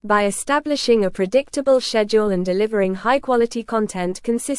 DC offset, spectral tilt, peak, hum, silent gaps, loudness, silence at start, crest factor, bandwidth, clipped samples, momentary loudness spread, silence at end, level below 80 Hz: under 0.1%; -4.5 dB/octave; -4 dBFS; none; none; -19 LUFS; 0.05 s; 14 dB; 12 kHz; under 0.1%; 5 LU; 0 s; -48 dBFS